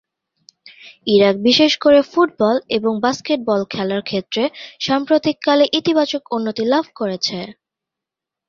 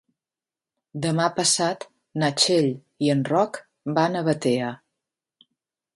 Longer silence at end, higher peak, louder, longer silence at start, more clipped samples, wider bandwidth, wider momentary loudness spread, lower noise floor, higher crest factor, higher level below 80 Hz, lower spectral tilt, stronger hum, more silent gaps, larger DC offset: second, 0.95 s vs 1.2 s; first, -2 dBFS vs -6 dBFS; first, -17 LUFS vs -23 LUFS; about the same, 0.85 s vs 0.95 s; neither; second, 7.4 kHz vs 11.5 kHz; second, 9 LU vs 15 LU; second, -85 dBFS vs under -90 dBFS; about the same, 16 dB vs 20 dB; first, -58 dBFS vs -68 dBFS; about the same, -4.5 dB/octave vs -4 dB/octave; neither; neither; neither